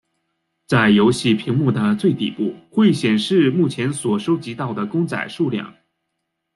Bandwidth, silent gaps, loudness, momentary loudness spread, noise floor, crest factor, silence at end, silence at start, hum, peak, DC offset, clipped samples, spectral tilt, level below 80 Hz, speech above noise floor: 12 kHz; none; -19 LUFS; 9 LU; -76 dBFS; 16 dB; 0.85 s; 0.7 s; none; -4 dBFS; under 0.1%; under 0.1%; -6 dB/octave; -58 dBFS; 58 dB